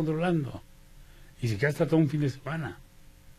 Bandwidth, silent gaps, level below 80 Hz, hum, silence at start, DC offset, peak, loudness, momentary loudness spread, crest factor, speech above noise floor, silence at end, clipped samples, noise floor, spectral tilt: 14.5 kHz; none; -52 dBFS; none; 0 s; under 0.1%; -12 dBFS; -29 LUFS; 15 LU; 18 dB; 24 dB; 0.05 s; under 0.1%; -52 dBFS; -7.5 dB/octave